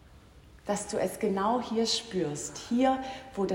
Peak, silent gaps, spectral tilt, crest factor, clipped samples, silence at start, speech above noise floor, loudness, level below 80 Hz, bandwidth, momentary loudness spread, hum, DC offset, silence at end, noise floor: -14 dBFS; none; -4 dB/octave; 16 dB; under 0.1%; 0.05 s; 24 dB; -30 LUFS; -58 dBFS; 16 kHz; 8 LU; none; under 0.1%; 0 s; -54 dBFS